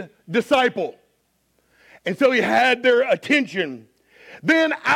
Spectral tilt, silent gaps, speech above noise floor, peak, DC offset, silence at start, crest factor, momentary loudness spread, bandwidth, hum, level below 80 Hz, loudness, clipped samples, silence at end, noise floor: -4.5 dB/octave; none; 47 dB; -4 dBFS; under 0.1%; 0 s; 16 dB; 12 LU; 15.5 kHz; none; -66 dBFS; -19 LUFS; under 0.1%; 0 s; -67 dBFS